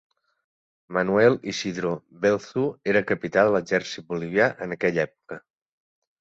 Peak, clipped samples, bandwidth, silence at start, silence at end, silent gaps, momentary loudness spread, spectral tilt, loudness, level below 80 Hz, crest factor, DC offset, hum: -4 dBFS; under 0.1%; 8 kHz; 0.9 s; 0.8 s; none; 11 LU; -5.5 dB/octave; -24 LUFS; -62 dBFS; 20 dB; under 0.1%; none